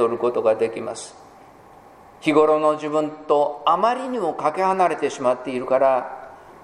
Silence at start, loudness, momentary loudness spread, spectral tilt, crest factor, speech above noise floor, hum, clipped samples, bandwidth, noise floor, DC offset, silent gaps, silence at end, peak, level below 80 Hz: 0 s; -21 LUFS; 11 LU; -5 dB/octave; 18 dB; 26 dB; none; under 0.1%; 11.5 kHz; -47 dBFS; under 0.1%; none; 0.1 s; -2 dBFS; -66 dBFS